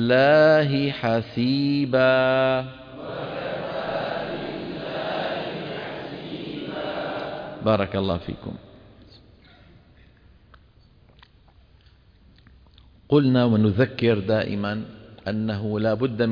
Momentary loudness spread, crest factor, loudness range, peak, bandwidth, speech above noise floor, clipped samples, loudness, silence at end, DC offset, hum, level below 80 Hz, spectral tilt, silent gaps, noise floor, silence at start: 15 LU; 18 dB; 8 LU; -6 dBFS; 5.2 kHz; 34 dB; under 0.1%; -23 LUFS; 0 s; under 0.1%; none; -54 dBFS; -8.5 dB/octave; none; -54 dBFS; 0 s